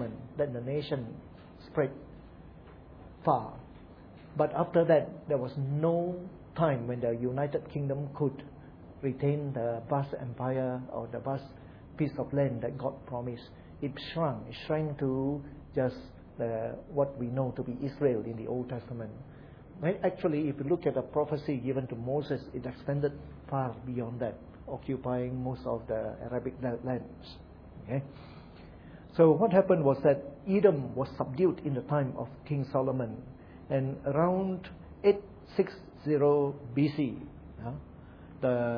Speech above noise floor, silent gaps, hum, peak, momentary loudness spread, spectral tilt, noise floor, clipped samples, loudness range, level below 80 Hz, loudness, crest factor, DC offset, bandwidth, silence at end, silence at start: 20 dB; none; none; -10 dBFS; 23 LU; -10.5 dB/octave; -51 dBFS; under 0.1%; 7 LU; -56 dBFS; -32 LUFS; 22 dB; under 0.1%; 5.4 kHz; 0 s; 0 s